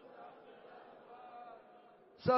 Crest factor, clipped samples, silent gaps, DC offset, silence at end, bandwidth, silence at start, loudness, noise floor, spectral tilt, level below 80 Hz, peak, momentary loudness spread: 22 dB; under 0.1%; none; under 0.1%; 0 s; 5.8 kHz; 0.05 s; -50 LUFS; -61 dBFS; -5 dB/octave; -76 dBFS; -20 dBFS; 9 LU